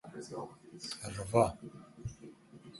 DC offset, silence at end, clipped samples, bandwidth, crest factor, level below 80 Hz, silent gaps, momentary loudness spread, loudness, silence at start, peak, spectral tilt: under 0.1%; 0 s; under 0.1%; 12 kHz; 24 dB; -58 dBFS; none; 23 LU; -36 LUFS; 0.05 s; -14 dBFS; -5.5 dB/octave